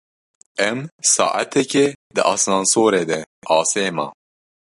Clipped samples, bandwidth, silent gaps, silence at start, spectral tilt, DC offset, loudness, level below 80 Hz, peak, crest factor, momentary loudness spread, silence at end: under 0.1%; 11.5 kHz; 0.92-0.99 s, 1.95-2.10 s, 3.26-3.42 s; 0.6 s; -2.5 dB/octave; under 0.1%; -18 LUFS; -64 dBFS; -2 dBFS; 18 dB; 9 LU; 0.65 s